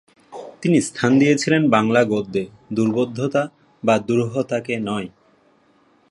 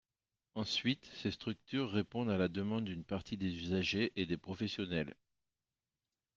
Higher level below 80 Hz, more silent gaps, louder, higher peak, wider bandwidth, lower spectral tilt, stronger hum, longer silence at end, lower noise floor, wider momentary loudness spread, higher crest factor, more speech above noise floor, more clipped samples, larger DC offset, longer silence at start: first, -60 dBFS vs -68 dBFS; neither; first, -20 LUFS vs -38 LUFS; first, -2 dBFS vs -20 dBFS; first, 11.5 kHz vs 7.6 kHz; about the same, -6 dB/octave vs -6 dB/octave; neither; second, 1 s vs 1.25 s; second, -58 dBFS vs under -90 dBFS; first, 12 LU vs 7 LU; about the same, 20 dB vs 18 dB; second, 39 dB vs over 52 dB; neither; neither; second, 0.3 s vs 0.55 s